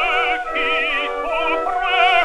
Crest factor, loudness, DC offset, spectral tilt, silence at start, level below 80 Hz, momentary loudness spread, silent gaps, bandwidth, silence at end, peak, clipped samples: 14 dB; -18 LUFS; under 0.1%; -2 dB/octave; 0 s; -42 dBFS; 5 LU; none; 12 kHz; 0 s; -4 dBFS; under 0.1%